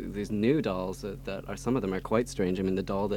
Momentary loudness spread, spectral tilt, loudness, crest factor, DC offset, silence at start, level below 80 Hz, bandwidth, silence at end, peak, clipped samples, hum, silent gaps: 10 LU; -6.5 dB/octave; -30 LUFS; 18 dB; under 0.1%; 0 s; -48 dBFS; 17.5 kHz; 0 s; -12 dBFS; under 0.1%; none; none